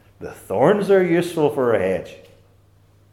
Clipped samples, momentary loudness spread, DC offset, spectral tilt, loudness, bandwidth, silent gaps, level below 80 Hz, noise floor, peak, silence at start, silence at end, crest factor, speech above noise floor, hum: under 0.1%; 20 LU; under 0.1%; -7 dB/octave; -19 LUFS; 14 kHz; none; -60 dBFS; -54 dBFS; -2 dBFS; 0.2 s; 0.95 s; 18 dB; 35 dB; none